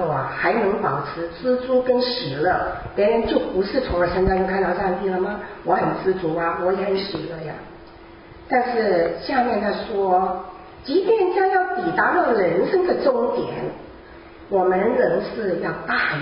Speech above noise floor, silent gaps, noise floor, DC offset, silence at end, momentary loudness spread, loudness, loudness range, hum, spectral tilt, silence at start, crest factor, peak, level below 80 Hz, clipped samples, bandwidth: 22 dB; none; -43 dBFS; under 0.1%; 0 s; 10 LU; -21 LUFS; 4 LU; none; -10.5 dB/octave; 0 s; 16 dB; -4 dBFS; -44 dBFS; under 0.1%; 5.4 kHz